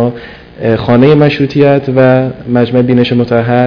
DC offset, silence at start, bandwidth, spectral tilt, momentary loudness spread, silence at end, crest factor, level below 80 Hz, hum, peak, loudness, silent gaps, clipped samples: under 0.1%; 0 s; 5.4 kHz; -9 dB/octave; 7 LU; 0 s; 8 dB; -40 dBFS; none; 0 dBFS; -9 LUFS; none; 3%